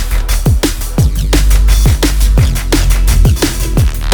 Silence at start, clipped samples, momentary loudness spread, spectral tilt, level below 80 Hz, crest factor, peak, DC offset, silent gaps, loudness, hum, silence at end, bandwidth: 0 s; under 0.1%; 3 LU; -5 dB/octave; -10 dBFS; 10 dB; 0 dBFS; under 0.1%; none; -12 LUFS; none; 0 s; over 20 kHz